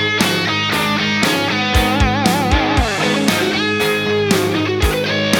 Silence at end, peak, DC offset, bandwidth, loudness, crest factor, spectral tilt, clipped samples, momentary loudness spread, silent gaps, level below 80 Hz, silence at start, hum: 0 s; 0 dBFS; under 0.1%; 19 kHz; -15 LUFS; 16 dB; -4 dB/octave; under 0.1%; 2 LU; none; -26 dBFS; 0 s; none